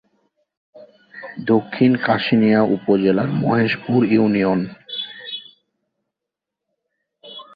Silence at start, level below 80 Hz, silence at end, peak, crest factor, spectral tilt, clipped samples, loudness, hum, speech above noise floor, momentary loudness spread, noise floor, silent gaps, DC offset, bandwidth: 0.75 s; -58 dBFS; 0.15 s; -2 dBFS; 18 dB; -9.5 dB/octave; under 0.1%; -18 LUFS; none; 68 dB; 16 LU; -84 dBFS; none; under 0.1%; 5 kHz